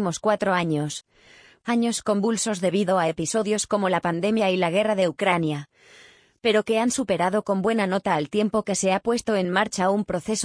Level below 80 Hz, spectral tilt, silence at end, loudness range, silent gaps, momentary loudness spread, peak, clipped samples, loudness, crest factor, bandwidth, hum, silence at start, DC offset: -60 dBFS; -4.5 dB/octave; 0 s; 2 LU; none; 4 LU; -6 dBFS; under 0.1%; -23 LUFS; 18 dB; 10.5 kHz; none; 0 s; under 0.1%